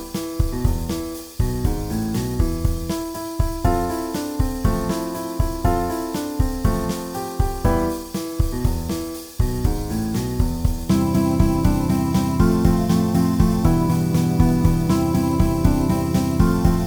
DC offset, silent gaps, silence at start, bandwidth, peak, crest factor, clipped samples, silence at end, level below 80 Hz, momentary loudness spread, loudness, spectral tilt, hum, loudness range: under 0.1%; none; 0 s; over 20 kHz; -4 dBFS; 16 dB; under 0.1%; 0 s; -26 dBFS; 8 LU; -21 LUFS; -7 dB/octave; none; 5 LU